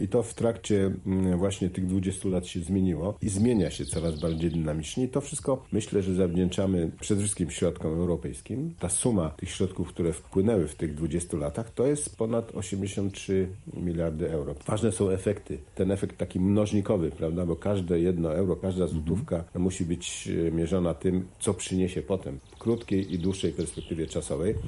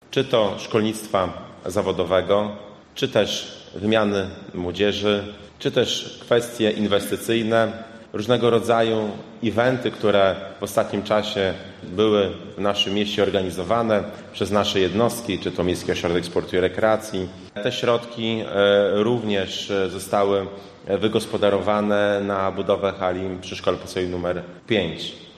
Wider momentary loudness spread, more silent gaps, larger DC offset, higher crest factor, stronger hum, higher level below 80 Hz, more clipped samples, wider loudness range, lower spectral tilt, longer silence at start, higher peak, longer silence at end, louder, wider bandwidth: second, 6 LU vs 9 LU; neither; neither; about the same, 16 dB vs 18 dB; neither; first, -44 dBFS vs -56 dBFS; neither; about the same, 2 LU vs 2 LU; about the same, -6 dB/octave vs -5 dB/octave; about the same, 0 s vs 0.1 s; second, -12 dBFS vs -4 dBFS; about the same, 0 s vs 0.05 s; second, -29 LUFS vs -22 LUFS; second, 11.5 kHz vs 13.5 kHz